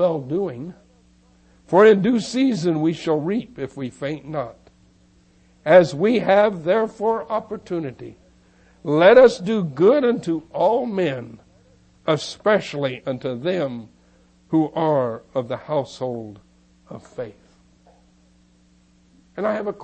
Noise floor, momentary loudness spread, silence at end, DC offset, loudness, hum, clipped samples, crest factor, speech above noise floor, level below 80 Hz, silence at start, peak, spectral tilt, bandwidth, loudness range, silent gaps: -56 dBFS; 20 LU; 0 s; under 0.1%; -20 LUFS; none; under 0.1%; 20 dB; 37 dB; -58 dBFS; 0 s; -2 dBFS; -6.5 dB/octave; 8.8 kHz; 12 LU; none